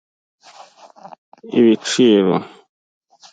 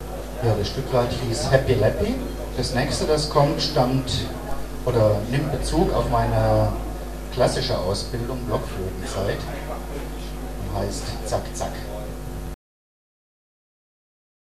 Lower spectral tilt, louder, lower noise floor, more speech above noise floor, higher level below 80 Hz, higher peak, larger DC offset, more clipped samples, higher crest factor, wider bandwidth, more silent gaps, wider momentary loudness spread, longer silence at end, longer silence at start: about the same, -5 dB/octave vs -5.5 dB/octave; first, -15 LUFS vs -24 LUFS; second, -44 dBFS vs under -90 dBFS; second, 30 dB vs over 68 dB; second, -66 dBFS vs -32 dBFS; about the same, -2 dBFS vs -2 dBFS; second, under 0.1% vs 0.6%; neither; second, 16 dB vs 22 dB; second, 9.4 kHz vs 14 kHz; neither; second, 9 LU vs 13 LU; second, 0.85 s vs 2 s; first, 1.45 s vs 0 s